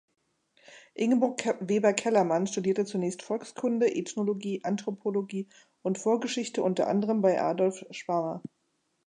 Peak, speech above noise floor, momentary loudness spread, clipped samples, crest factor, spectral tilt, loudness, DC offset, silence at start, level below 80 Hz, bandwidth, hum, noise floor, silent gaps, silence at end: -10 dBFS; 48 dB; 11 LU; under 0.1%; 20 dB; -5.5 dB/octave; -29 LUFS; under 0.1%; 0.7 s; -80 dBFS; 10.5 kHz; none; -76 dBFS; none; 0.6 s